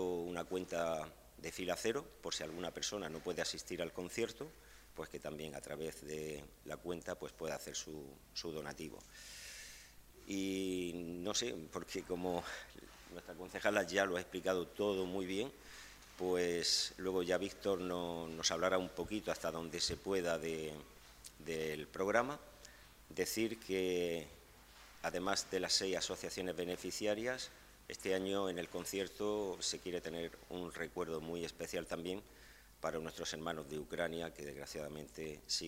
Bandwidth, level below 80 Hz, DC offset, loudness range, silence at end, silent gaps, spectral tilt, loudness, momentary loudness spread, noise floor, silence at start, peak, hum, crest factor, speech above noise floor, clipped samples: 16 kHz; -64 dBFS; under 0.1%; 8 LU; 0 s; none; -3 dB/octave; -40 LUFS; 16 LU; -60 dBFS; 0 s; -16 dBFS; none; 26 dB; 20 dB; under 0.1%